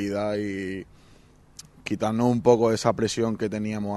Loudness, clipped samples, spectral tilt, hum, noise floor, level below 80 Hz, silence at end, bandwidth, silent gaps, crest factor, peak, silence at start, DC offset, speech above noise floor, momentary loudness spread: -25 LUFS; under 0.1%; -6 dB/octave; none; -54 dBFS; -56 dBFS; 0 s; 12.5 kHz; none; 20 dB; -4 dBFS; 0 s; under 0.1%; 29 dB; 13 LU